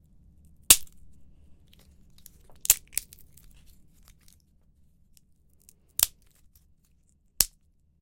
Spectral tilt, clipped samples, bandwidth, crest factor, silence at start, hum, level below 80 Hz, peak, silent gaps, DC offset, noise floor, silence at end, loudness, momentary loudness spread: 1.5 dB/octave; under 0.1%; 17 kHz; 32 dB; 0.7 s; none; -54 dBFS; 0 dBFS; none; under 0.1%; -64 dBFS; 0.55 s; -23 LUFS; 15 LU